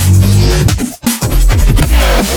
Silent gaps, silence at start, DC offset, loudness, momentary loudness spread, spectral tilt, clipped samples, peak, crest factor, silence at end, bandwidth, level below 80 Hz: none; 0 s; under 0.1%; -11 LUFS; 6 LU; -5 dB/octave; 0.3%; 0 dBFS; 8 dB; 0 s; 19.5 kHz; -12 dBFS